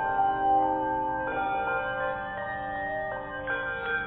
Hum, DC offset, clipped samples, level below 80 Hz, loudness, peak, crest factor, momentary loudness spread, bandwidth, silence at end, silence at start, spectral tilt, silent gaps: none; under 0.1%; under 0.1%; -52 dBFS; -29 LUFS; -16 dBFS; 14 dB; 9 LU; 4 kHz; 0 s; 0 s; -3 dB/octave; none